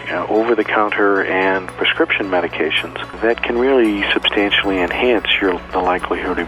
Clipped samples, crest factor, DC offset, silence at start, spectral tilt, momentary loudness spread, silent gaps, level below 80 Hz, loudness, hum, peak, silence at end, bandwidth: under 0.1%; 14 dB; under 0.1%; 0 s; -5 dB/octave; 5 LU; none; -42 dBFS; -16 LUFS; 60 Hz at -40 dBFS; -2 dBFS; 0 s; 13 kHz